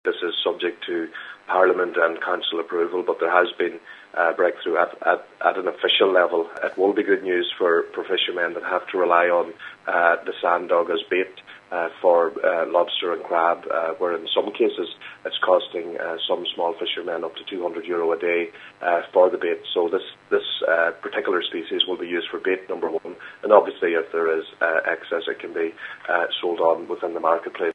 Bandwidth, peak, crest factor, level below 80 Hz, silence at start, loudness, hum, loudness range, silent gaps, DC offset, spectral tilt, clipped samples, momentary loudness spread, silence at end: 5.8 kHz; 0 dBFS; 22 dB; -78 dBFS; 0.05 s; -22 LUFS; none; 3 LU; none; under 0.1%; -5 dB/octave; under 0.1%; 10 LU; 0 s